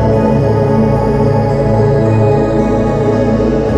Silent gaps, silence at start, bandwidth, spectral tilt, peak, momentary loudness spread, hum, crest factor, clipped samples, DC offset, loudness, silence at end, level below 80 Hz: none; 0 s; 8.4 kHz; -9 dB/octave; 0 dBFS; 2 LU; none; 10 dB; under 0.1%; under 0.1%; -12 LUFS; 0 s; -24 dBFS